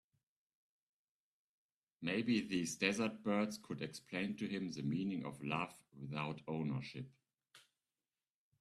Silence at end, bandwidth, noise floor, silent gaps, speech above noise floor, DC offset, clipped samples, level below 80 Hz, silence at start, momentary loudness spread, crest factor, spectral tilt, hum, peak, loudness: 1 s; 13.5 kHz; under -90 dBFS; none; over 50 dB; under 0.1%; under 0.1%; -78 dBFS; 2 s; 10 LU; 24 dB; -5 dB/octave; none; -20 dBFS; -41 LUFS